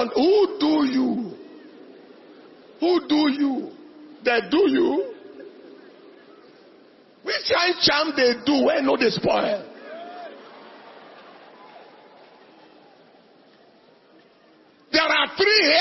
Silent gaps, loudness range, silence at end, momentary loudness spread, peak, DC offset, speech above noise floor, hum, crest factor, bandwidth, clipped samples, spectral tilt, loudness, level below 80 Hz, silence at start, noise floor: none; 9 LU; 0 s; 21 LU; -4 dBFS; under 0.1%; 35 dB; none; 20 dB; 6 kHz; under 0.1%; -4.5 dB/octave; -20 LUFS; -62 dBFS; 0 s; -55 dBFS